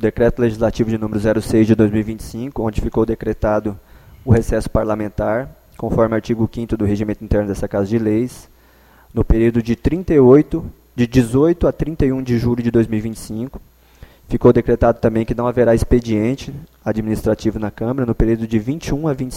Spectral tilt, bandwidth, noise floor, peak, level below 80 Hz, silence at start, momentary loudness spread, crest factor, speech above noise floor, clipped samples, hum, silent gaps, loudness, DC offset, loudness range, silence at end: -8 dB/octave; 16 kHz; -49 dBFS; 0 dBFS; -30 dBFS; 0 s; 12 LU; 16 dB; 32 dB; under 0.1%; none; none; -18 LUFS; under 0.1%; 4 LU; 0 s